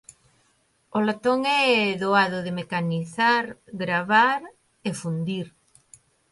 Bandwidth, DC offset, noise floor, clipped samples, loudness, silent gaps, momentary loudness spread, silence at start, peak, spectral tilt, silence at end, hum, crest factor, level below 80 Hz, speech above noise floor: 11.5 kHz; under 0.1%; -66 dBFS; under 0.1%; -23 LUFS; none; 13 LU; 0.95 s; -6 dBFS; -5 dB/octave; 0.85 s; none; 20 dB; -68 dBFS; 43 dB